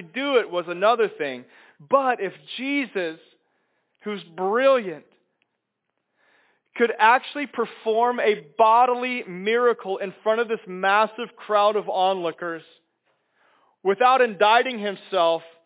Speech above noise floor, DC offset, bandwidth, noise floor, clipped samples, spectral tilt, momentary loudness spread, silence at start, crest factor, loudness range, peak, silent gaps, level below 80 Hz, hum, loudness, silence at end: 57 dB; under 0.1%; 4 kHz; -79 dBFS; under 0.1%; -8 dB/octave; 14 LU; 0 s; 20 dB; 6 LU; -4 dBFS; none; under -90 dBFS; none; -22 LUFS; 0.2 s